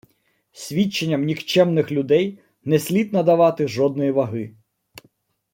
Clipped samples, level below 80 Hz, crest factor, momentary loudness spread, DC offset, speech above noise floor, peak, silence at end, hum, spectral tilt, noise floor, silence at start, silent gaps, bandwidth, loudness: under 0.1%; -64 dBFS; 18 dB; 11 LU; under 0.1%; 46 dB; -4 dBFS; 1.05 s; none; -6 dB/octave; -65 dBFS; 0.55 s; none; 16.5 kHz; -20 LUFS